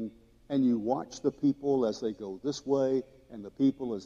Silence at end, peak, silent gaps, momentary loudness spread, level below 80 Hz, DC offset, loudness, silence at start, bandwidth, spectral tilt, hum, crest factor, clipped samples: 0 s; -14 dBFS; none; 11 LU; -66 dBFS; under 0.1%; -30 LUFS; 0 s; 7.4 kHz; -7 dB/octave; none; 16 dB; under 0.1%